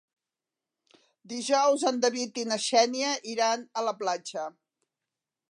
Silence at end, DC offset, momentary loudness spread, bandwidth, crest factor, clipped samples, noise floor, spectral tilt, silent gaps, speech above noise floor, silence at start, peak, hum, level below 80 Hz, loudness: 1 s; under 0.1%; 12 LU; 11 kHz; 20 dB; under 0.1%; -90 dBFS; -1.5 dB/octave; none; 62 dB; 1.25 s; -10 dBFS; none; -88 dBFS; -27 LUFS